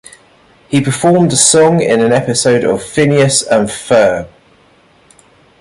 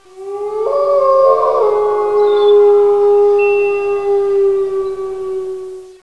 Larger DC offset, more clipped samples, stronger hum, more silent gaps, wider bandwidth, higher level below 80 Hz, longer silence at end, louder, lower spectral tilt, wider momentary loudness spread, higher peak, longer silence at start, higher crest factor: second, under 0.1% vs 0.9%; neither; neither; neither; first, 13.5 kHz vs 6.2 kHz; about the same, -48 dBFS vs -52 dBFS; first, 1.35 s vs 0.1 s; about the same, -11 LUFS vs -13 LUFS; about the same, -4 dB/octave vs -5 dB/octave; second, 7 LU vs 13 LU; about the same, 0 dBFS vs 0 dBFS; first, 0.7 s vs 0.15 s; about the same, 12 dB vs 12 dB